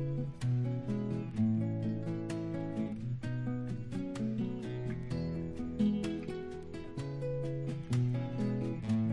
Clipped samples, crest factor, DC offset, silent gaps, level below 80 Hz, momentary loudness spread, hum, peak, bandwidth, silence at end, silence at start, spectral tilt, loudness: under 0.1%; 14 dB; under 0.1%; none; -56 dBFS; 7 LU; none; -22 dBFS; 11.5 kHz; 0 s; 0 s; -8.5 dB/octave; -36 LUFS